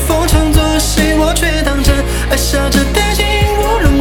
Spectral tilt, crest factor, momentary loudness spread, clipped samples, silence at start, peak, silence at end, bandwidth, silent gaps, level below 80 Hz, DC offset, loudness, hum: -4.5 dB/octave; 10 dB; 2 LU; under 0.1%; 0 s; 0 dBFS; 0 s; 19 kHz; none; -16 dBFS; 0.2%; -12 LUFS; none